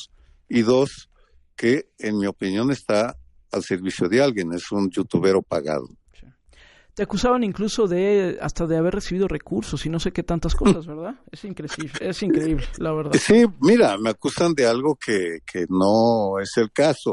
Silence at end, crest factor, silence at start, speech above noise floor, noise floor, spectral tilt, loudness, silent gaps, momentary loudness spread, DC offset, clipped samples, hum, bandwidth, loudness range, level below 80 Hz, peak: 0 s; 16 dB; 0 s; 32 dB; -53 dBFS; -5.5 dB/octave; -22 LUFS; none; 11 LU; under 0.1%; under 0.1%; none; 11.5 kHz; 5 LU; -38 dBFS; -6 dBFS